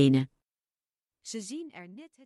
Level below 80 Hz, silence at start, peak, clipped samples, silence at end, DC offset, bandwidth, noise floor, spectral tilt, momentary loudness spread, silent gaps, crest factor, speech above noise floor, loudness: -70 dBFS; 0 s; -10 dBFS; under 0.1%; 0.2 s; under 0.1%; 11.5 kHz; under -90 dBFS; -6.5 dB/octave; 21 LU; none; 20 dB; over 61 dB; -32 LUFS